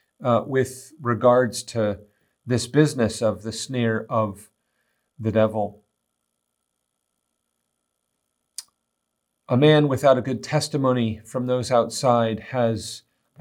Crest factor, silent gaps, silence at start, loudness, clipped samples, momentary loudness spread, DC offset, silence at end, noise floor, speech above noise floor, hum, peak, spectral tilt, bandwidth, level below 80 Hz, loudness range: 20 dB; none; 0.2 s; -22 LUFS; under 0.1%; 12 LU; under 0.1%; 0.4 s; -78 dBFS; 57 dB; none; -4 dBFS; -6 dB/octave; 16.5 kHz; -64 dBFS; 9 LU